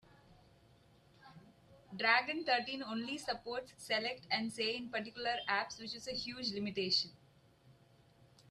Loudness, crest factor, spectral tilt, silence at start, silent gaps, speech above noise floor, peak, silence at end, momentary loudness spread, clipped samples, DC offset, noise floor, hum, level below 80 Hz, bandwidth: -37 LUFS; 24 dB; -3 dB/octave; 0.3 s; none; 28 dB; -16 dBFS; 0.8 s; 11 LU; under 0.1%; under 0.1%; -66 dBFS; none; -74 dBFS; 13.5 kHz